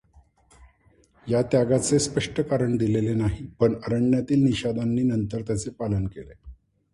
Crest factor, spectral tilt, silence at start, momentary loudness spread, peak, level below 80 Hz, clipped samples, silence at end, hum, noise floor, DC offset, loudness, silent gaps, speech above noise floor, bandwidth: 16 dB; -6 dB/octave; 0.6 s; 8 LU; -8 dBFS; -46 dBFS; under 0.1%; 0.4 s; none; -60 dBFS; under 0.1%; -24 LUFS; none; 37 dB; 11.5 kHz